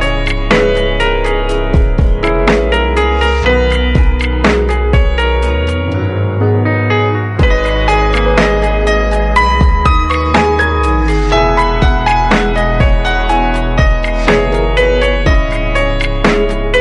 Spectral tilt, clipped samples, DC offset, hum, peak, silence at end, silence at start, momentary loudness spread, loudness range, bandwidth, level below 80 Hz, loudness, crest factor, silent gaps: -6.5 dB/octave; under 0.1%; under 0.1%; none; 0 dBFS; 0 s; 0 s; 3 LU; 2 LU; 11 kHz; -14 dBFS; -12 LUFS; 10 dB; none